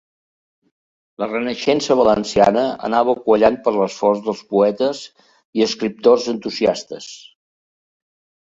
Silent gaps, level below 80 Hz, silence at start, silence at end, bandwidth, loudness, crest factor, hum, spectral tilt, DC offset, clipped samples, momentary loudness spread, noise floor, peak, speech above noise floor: 5.45-5.53 s; -54 dBFS; 1.2 s; 1.3 s; 7.8 kHz; -18 LUFS; 18 dB; none; -5 dB/octave; under 0.1%; under 0.1%; 12 LU; under -90 dBFS; 0 dBFS; over 73 dB